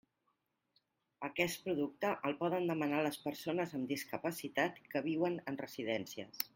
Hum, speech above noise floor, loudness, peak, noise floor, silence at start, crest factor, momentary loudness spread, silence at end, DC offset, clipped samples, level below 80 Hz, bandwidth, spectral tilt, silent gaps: none; 45 dB; -38 LUFS; -14 dBFS; -82 dBFS; 1.2 s; 24 dB; 6 LU; 0.1 s; under 0.1%; under 0.1%; -78 dBFS; 16.5 kHz; -5 dB/octave; none